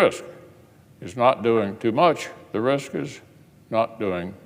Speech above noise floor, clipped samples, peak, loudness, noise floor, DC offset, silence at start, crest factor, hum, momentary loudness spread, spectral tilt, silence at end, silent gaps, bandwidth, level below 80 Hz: 28 dB; under 0.1%; -4 dBFS; -23 LUFS; -51 dBFS; under 0.1%; 0 s; 20 dB; none; 17 LU; -6 dB/octave; 0.1 s; none; 16 kHz; -64 dBFS